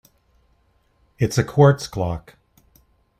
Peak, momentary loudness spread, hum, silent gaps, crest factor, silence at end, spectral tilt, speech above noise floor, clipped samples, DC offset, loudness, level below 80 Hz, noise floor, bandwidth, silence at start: -2 dBFS; 12 LU; none; none; 22 dB; 1 s; -6.5 dB/octave; 44 dB; under 0.1%; under 0.1%; -19 LUFS; -48 dBFS; -62 dBFS; 15 kHz; 1.2 s